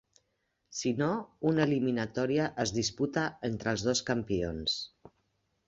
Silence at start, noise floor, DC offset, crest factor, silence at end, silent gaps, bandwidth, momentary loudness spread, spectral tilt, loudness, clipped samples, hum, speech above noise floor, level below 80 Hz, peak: 0.7 s; -79 dBFS; under 0.1%; 18 dB; 0.6 s; none; 8.2 kHz; 6 LU; -4.5 dB/octave; -31 LUFS; under 0.1%; none; 48 dB; -56 dBFS; -14 dBFS